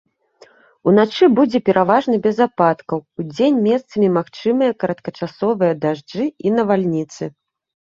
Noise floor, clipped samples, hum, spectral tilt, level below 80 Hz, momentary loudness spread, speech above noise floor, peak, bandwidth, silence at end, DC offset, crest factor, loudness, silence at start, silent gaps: -50 dBFS; under 0.1%; none; -7.5 dB/octave; -62 dBFS; 11 LU; 34 dB; -2 dBFS; 7.6 kHz; 0.6 s; under 0.1%; 16 dB; -17 LUFS; 0.85 s; none